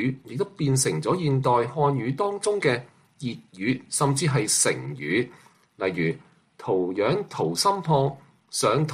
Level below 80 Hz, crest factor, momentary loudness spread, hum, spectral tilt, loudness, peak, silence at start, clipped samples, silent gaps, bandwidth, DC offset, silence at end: -62 dBFS; 16 dB; 10 LU; none; -4.5 dB/octave; -25 LUFS; -8 dBFS; 0 s; under 0.1%; none; 15 kHz; under 0.1%; 0 s